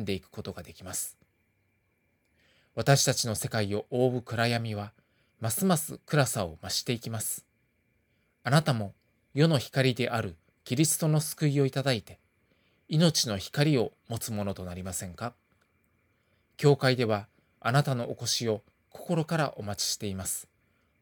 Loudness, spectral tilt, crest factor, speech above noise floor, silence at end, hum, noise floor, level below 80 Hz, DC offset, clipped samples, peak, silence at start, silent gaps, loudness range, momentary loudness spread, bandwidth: -29 LUFS; -4.5 dB/octave; 22 dB; 44 dB; 0.6 s; none; -73 dBFS; -66 dBFS; under 0.1%; under 0.1%; -8 dBFS; 0 s; none; 3 LU; 13 LU; 19.5 kHz